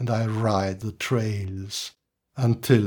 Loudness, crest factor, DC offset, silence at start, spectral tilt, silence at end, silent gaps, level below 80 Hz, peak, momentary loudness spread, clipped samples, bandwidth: -26 LUFS; 20 dB; under 0.1%; 0 s; -6 dB/octave; 0 s; none; -62 dBFS; -4 dBFS; 8 LU; under 0.1%; 19 kHz